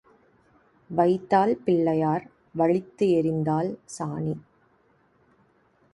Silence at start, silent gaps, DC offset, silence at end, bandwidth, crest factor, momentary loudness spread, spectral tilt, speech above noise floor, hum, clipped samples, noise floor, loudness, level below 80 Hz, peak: 0.9 s; none; under 0.1%; 1.55 s; 11.5 kHz; 18 dB; 11 LU; -7.5 dB/octave; 40 dB; none; under 0.1%; -64 dBFS; -25 LUFS; -64 dBFS; -8 dBFS